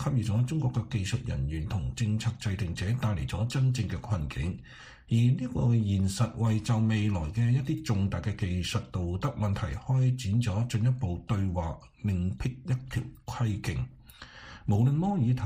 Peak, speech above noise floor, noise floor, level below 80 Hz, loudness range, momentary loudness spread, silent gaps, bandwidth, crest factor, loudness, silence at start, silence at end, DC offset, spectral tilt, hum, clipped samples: -16 dBFS; 21 dB; -49 dBFS; -46 dBFS; 4 LU; 9 LU; none; 14.5 kHz; 14 dB; -30 LUFS; 0 s; 0 s; under 0.1%; -7 dB/octave; none; under 0.1%